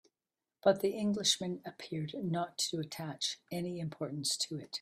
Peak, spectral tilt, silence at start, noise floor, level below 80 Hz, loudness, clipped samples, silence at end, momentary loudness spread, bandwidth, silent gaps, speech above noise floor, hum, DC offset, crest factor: -14 dBFS; -3.5 dB/octave; 0.65 s; under -90 dBFS; -76 dBFS; -35 LUFS; under 0.1%; 0 s; 10 LU; 15.5 kHz; none; over 54 dB; none; under 0.1%; 22 dB